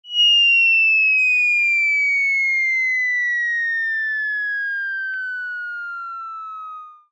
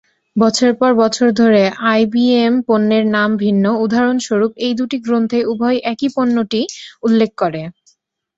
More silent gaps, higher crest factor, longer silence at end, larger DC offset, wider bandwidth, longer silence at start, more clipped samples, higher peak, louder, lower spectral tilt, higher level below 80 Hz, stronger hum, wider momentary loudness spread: neither; about the same, 10 dB vs 14 dB; second, 0.2 s vs 0.65 s; neither; about the same, 8 kHz vs 8 kHz; second, 0.05 s vs 0.35 s; neither; second, -10 dBFS vs -2 dBFS; about the same, -16 LUFS vs -15 LUFS; second, 9 dB/octave vs -5.5 dB/octave; second, under -90 dBFS vs -58 dBFS; neither; first, 18 LU vs 7 LU